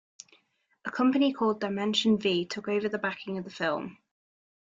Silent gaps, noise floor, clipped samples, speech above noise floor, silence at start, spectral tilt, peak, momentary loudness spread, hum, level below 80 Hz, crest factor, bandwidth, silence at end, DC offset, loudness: none; -70 dBFS; under 0.1%; 42 dB; 0.85 s; -5 dB/octave; -12 dBFS; 12 LU; none; -72 dBFS; 18 dB; 7.8 kHz; 0.8 s; under 0.1%; -28 LUFS